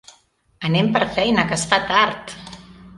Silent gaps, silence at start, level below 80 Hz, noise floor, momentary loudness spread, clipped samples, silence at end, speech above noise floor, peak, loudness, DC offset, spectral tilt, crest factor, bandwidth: none; 0.6 s; -50 dBFS; -58 dBFS; 18 LU; under 0.1%; 0 s; 39 dB; 0 dBFS; -18 LUFS; under 0.1%; -4.5 dB/octave; 20 dB; 11.5 kHz